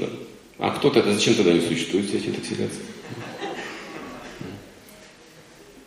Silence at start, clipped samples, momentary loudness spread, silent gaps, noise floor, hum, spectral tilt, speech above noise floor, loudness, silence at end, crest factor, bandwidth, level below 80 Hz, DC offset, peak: 0 s; under 0.1%; 19 LU; none; -48 dBFS; none; -4.5 dB/octave; 26 dB; -23 LUFS; 0 s; 20 dB; 15 kHz; -60 dBFS; under 0.1%; -4 dBFS